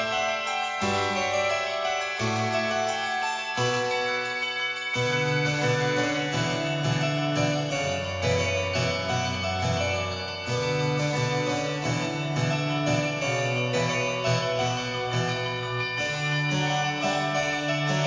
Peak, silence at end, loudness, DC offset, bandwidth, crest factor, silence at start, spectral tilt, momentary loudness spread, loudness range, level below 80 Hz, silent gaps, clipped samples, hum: -12 dBFS; 0 s; -26 LUFS; under 0.1%; 7.6 kHz; 14 dB; 0 s; -4.5 dB/octave; 3 LU; 1 LU; -50 dBFS; none; under 0.1%; none